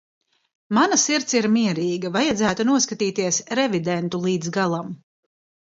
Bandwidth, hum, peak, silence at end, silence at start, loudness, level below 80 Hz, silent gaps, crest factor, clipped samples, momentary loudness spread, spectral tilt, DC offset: 7.8 kHz; none; -6 dBFS; 0.8 s; 0.7 s; -21 LUFS; -60 dBFS; none; 18 dB; under 0.1%; 6 LU; -3.5 dB/octave; under 0.1%